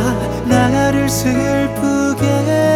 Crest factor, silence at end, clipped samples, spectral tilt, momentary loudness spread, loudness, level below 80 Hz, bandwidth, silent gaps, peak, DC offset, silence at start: 14 dB; 0 s; under 0.1%; -5.5 dB/octave; 3 LU; -15 LUFS; -34 dBFS; 17 kHz; none; -2 dBFS; under 0.1%; 0 s